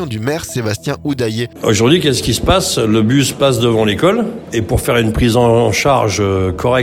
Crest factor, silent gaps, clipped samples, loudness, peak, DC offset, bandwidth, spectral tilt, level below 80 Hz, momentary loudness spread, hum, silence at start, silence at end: 14 dB; none; under 0.1%; -14 LUFS; 0 dBFS; under 0.1%; 19 kHz; -5 dB/octave; -32 dBFS; 8 LU; none; 0 s; 0 s